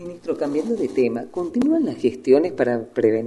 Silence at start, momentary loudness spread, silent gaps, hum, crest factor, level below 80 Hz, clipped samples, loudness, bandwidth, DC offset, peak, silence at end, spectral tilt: 0 s; 8 LU; none; none; 18 dB; -58 dBFS; under 0.1%; -21 LUFS; 11.5 kHz; under 0.1%; -4 dBFS; 0 s; -7 dB/octave